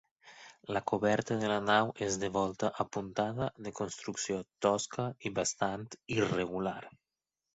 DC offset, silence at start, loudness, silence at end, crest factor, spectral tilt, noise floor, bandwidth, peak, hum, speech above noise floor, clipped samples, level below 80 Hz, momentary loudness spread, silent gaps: under 0.1%; 0.25 s; -34 LUFS; 0.65 s; 22 dB; -4 dB/octave; under -90 dBFS; 8 kHz; -12 dBFS; none; over 57 dB; under 0.1%; -64 dBFS; 10 LU; none